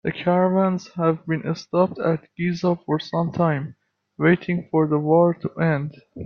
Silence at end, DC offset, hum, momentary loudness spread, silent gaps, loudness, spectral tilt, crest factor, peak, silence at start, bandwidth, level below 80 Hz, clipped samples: 0 s; under 0.1%; none; 7 LU; none; -22 LUFS; -8 dB/octave; 18 dB; -4 dBFS; 0.05 s; 6.6 kHz; -60 dBFS; under 0.1%